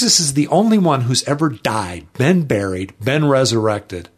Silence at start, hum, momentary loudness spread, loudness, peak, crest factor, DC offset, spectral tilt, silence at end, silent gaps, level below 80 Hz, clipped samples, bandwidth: 0 s; none; 10 LU; -16 LUFS; -2 dBFS; 16 dB; under 0.1%; -4.5 dB/octave; 0.15 s; none; -50 dBFS; under 0.1%; 13.5 kHz